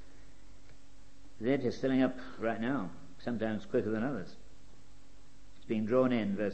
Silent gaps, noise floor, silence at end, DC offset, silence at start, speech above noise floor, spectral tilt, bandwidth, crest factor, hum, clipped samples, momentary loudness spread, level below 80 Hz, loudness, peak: none; -59 dBFS; 0 s; 0.8%; 0.2 s; 27 dB; -7.5 dB/octave; 8.6 kHz; 20 dB; none; under 0.1%; 11 LU; -60 dBFS; -34 LUFS; -16 dBFS